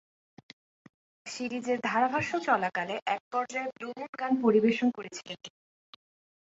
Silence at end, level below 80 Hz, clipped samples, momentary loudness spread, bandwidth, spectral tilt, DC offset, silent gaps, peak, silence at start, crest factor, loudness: 1.05 s; -74 dBFS; under 0.1%; 17 LU; 8 kHz; -5 dB/octave; under 0.1%; 3.02-3.06 s, 3.20-3.31 s, 4.09-4.13 s; -12 dBFS; 1.25 s; 20 dB; -30 LUFS